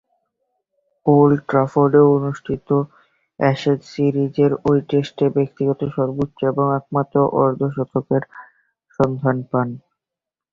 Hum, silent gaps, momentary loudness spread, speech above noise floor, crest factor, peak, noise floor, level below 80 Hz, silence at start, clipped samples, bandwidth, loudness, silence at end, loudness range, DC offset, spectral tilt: none; none; 9 LU; 69 dB; 18 dB; -2 dBFS; -87 dBFS; -54 dBFS; 1.05 s; under 0.1%; 7.4 kHz; -19 LUFS; 0.75 s; 3 LU; under 0.1%; -9 dB/octave